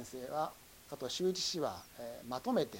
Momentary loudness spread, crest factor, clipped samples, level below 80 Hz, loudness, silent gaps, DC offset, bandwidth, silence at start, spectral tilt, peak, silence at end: 13 LU; 18 dB; under 0.1%; -68 dBFS; -39 LUFS; none; under 0.1%; 17 kHz; 0 s; -4 dB/octave; -20 dBFS; 0 s